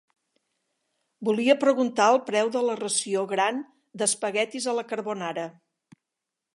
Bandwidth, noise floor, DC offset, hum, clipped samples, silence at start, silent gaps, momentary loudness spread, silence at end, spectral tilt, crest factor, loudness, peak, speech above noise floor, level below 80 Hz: 11.5 kHz; -86 dBFS; under 0.1%; none; under 0.1%; 1.2 s; none; 11 LU; 1.05 s; -3 dB/octave; 20 dB; -25 LUFS; -6 dBFS; 61 dB; -82 dBFS